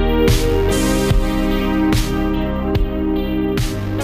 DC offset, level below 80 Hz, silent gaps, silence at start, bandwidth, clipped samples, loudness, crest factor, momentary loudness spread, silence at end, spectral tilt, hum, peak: under 0.1%; -22 dBFS; none; 0 s; 15.5 kHz; under 0.1%; -18 LUFS; 12 dB; 5 LU; 0 s; -6 dB/octave; none; -4 dBFS